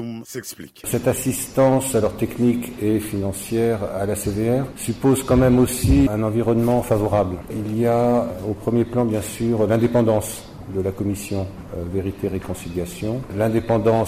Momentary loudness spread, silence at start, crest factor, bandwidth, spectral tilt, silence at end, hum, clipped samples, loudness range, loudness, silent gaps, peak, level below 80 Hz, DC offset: 11 LU; 0 s; 14 dB; 16 kHz; -6.5 dB/octave; 0 s; none; under 0.1%; 5 LU; -21 LUFS; none; -6 dBFS; -38 dBFS; under 0.1%